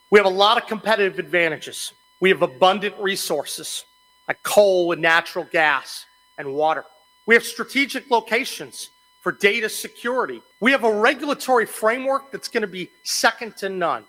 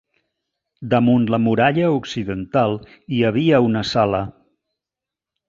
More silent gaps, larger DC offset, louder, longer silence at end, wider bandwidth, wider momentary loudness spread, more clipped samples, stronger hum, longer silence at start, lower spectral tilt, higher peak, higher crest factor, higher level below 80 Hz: neither; neither; about the same, -20 LUFS vs -18 LUFS; second, 0.1 s vs 1.2 s; first, 16.5 kHz vs 7.6 kHz; first, 13 LU vs 10 LU; neither; neither; second, 0.1 s vs 0.8 s; second, -3 dB/octave vs -7 dB/octave; about the same, -2 dBFS vs -2 dBFS; about the same, 18 dB vs 18 dB; second, -68 dBFS vs -50 dBFS